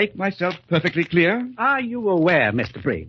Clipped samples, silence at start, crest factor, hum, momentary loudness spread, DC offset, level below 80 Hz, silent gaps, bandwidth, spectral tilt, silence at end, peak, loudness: under 0.1%; 0 s; 18 dB; none; 7 LU; under 0.1%; -54 dBFS; none; 7.2 kHz; -7.5 dB/octave; 0 s; -4 dBFS; -20 LUFS